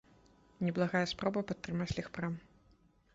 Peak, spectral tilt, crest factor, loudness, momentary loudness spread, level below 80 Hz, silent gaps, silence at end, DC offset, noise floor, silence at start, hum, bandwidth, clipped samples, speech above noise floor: -18 dBFS; -5 dB/octave; 20 dB; -36 LUFS; 8 LU; -60 dBFS; none; 0.75 s; under 0.1%; -67 dBFS; 0.6 s; none; 7.8 kHz; under 0.1%; 32 dB